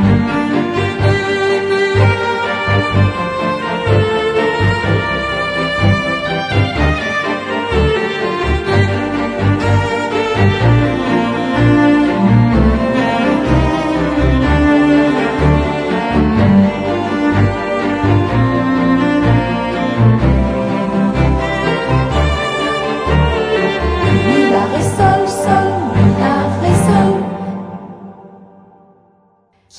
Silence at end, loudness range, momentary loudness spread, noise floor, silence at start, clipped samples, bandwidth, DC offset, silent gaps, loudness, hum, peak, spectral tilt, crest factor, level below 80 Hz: 1.35 s; 3 LU; 6 LU; -54 dBFS; 0 s; under 0.1%; 11 kHz; under 0.1%; none; -14 LUFS; none; 0 dBFS; -7 dB/octave; 12 dB; -26 dBFS